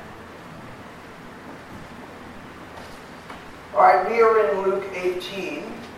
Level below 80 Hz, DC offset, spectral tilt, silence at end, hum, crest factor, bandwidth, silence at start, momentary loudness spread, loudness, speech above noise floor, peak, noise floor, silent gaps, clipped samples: -56 dBFS; under 0.1%; -5 dB/octave; 0 s; none; 22 dB; 15 kHz; 0 s; 23 LU; -21 LUFS; 20 dB; -2 dBFS; -41 dBFS; none; under 0.1%